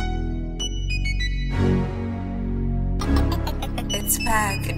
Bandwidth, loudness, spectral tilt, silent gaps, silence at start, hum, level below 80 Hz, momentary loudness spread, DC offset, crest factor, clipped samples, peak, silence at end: 16 kHz; -24 LUFS; -4.5 dB/octave; none; 0 s; none; -26 dBFS; 7 LU; under 0.1%; 16 dB; under 0.1%; -6 dBFS; 0 s